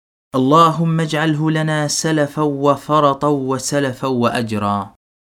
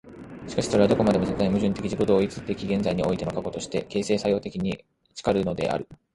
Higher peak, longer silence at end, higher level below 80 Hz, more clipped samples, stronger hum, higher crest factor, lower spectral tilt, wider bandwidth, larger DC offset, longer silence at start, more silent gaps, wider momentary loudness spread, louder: first, 0 dBFS vs -6 dBFS; first, 0.35 s vs 0.2 s; second, -56 dBFS vs -48 dBFS; neither; neither; about the same, 16 dB vs 20 dB; about the same, -5.5 dB/octave vs -6.5 dB/octave; first, 16 kHz vs 11.5 kHz; neither; first, 0.35 s vs 0.05 s; neither; second, 7 LU vs 10 LU; first, -17 LUFS vs -25 LUFS